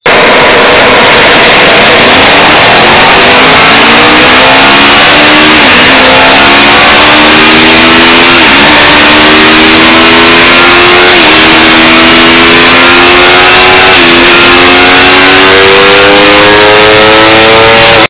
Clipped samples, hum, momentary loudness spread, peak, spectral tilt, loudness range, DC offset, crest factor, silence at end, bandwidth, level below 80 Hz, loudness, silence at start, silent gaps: 30%; none; 1 LU; 0 dBFS; -7.5 dB/octave; 0 LU; under 0.1%; 2 dB; 0.05 s; 4 kHz; -26 dBFS; 0 LUFS; 0.05 s; none